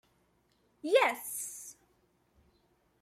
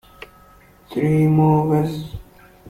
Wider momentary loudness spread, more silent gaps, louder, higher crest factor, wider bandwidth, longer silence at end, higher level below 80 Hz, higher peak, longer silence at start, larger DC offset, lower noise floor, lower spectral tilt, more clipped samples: about the same, 19 LU vs 18 LU; neither; second, -31 LUFS vs -18 LUFS; first, 22 dB vs 16 dB; first, 16 kHz vs 14.5 kHz; first, 1.3 s vs 0 s; second, -78 dBFS vs -46 dBFS; second, -14 dBFS vs -4 dBFS; about the same, 0.85 s vs 0.9 s; neither; first, -72 dBFS vs -49 dBFS; second, -0.5 dB/octave vs -9 dB/octave; neither